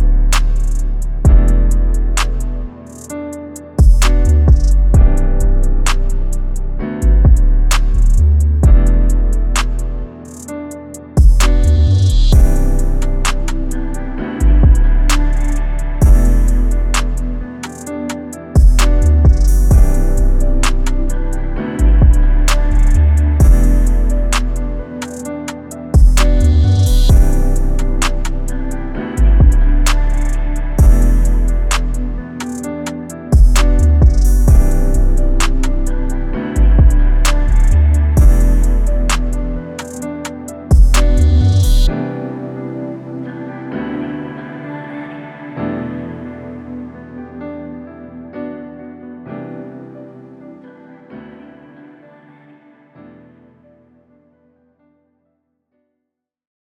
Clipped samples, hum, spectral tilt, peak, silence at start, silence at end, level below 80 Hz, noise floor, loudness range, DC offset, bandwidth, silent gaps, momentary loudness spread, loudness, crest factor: under 0.1%; none; -6 dB/octave; 0 dBFS; 0 s; 5.5 s; -12 dBFS; -77 dBFS; 13 LU; under 0.1%; 13.5 kHz; none; 17 LU; -15 LUFS; 12 dB